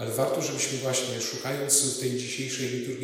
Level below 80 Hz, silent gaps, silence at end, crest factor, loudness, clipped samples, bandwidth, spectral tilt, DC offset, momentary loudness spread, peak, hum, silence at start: -72 dBFS; none; 0 s; 20 dB; -27 LUFS; under 0.1%; 16 kHz; -3 dB/octave; under 0.1%; 9 LU; -8 dBFS; none; 0 s